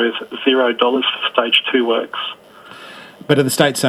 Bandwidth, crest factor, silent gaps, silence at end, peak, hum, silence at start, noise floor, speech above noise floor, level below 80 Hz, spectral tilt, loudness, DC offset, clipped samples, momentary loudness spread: 15.5 kHz; 18 dB; none; 0 s; 0 dBFS; none; 0 s; -38 dBFS; 22 dB; -66 dBFS; -4 dB/octave; -16 LUFS; under 0.1%; under 0.1%; 21 LU